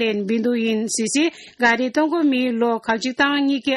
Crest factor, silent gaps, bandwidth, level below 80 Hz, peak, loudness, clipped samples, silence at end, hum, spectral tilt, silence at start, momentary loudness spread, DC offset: 16 dB; none; 12.5 kHz; -64 dBFS; -4 dBFS; -20 LUFS; under 0.1%; 0 s; none; -3 dB/octave; 0 s; 3 LU; under 0.1%